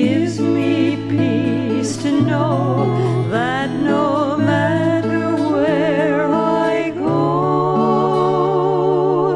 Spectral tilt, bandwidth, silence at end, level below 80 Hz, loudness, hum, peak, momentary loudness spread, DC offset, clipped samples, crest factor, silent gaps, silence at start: -7 dB/octave; 11.5 kHz; 0 s; -54 dBFS; -17 LUFS; none; -2 dBFS; 3 LU; under 0.1%; under 0.1%; 14 dB; none; 0 s